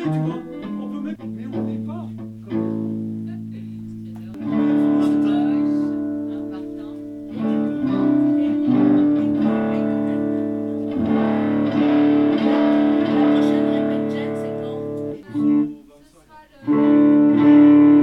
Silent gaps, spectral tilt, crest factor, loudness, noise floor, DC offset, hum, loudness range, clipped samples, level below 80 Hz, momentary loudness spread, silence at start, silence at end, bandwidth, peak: none; -9 dB/octave; 16 dB; -19 LUFS; -49 dBFS; under 0.1%; none; 9 LU; under 0.1%; -58 dBFS; 17 LU; 0 s; 0 s; 5.4 kHz; -4 dBFS